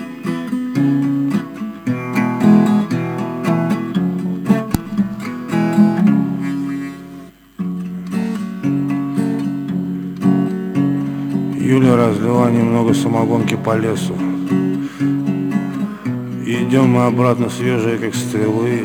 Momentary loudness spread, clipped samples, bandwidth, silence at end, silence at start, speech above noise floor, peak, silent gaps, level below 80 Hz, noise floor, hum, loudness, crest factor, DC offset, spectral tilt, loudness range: 11 LU; under 0.1%; 17 kHz; 0 s; 0 s; 22 dB; 0 dBFS; none; -52 dBFS; -37 dBFS; none; -17 LUFS; 16 dB; under 0.1%; -7.5 dB/octave; 5 LU